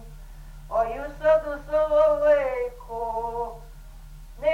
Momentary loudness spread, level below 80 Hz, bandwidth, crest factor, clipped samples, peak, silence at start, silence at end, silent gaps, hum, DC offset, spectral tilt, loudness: 13 LU; -42 dBFS; 13.5 kHz; 16 dB; under 0.1%; -10 dBFS; 0 s; 0 s; none; none; under 0.1%; -5.5 dB/octave; -24 LUFS